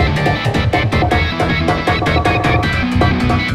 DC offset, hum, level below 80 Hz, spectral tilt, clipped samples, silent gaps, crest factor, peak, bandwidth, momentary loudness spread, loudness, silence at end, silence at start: under 0.1%; none; -26 dBFS; -6.5 dB/octave; under 0.1%; none; 12 dB; -2 dBFS; 14 kHz; 2 LU; -15 LUFS; 0 s; 0 s